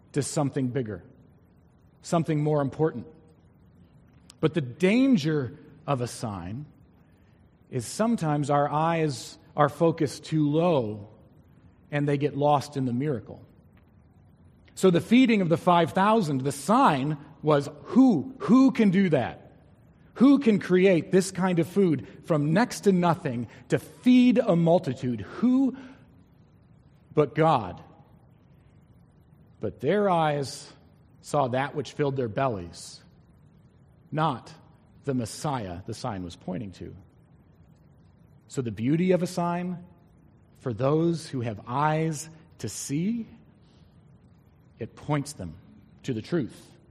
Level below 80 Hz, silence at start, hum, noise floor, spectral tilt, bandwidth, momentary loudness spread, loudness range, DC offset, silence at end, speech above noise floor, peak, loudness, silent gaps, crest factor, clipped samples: -62 dBFS; 0.15 s; none; -58 dBFS; -6.5 dB/octave; 13.5 kHz; 17 LU; 11 LU; under 0.1%; 0.4 s; 33 dB; -6 dBFS; -25 LUFS; none; 22 dB; under 0.1%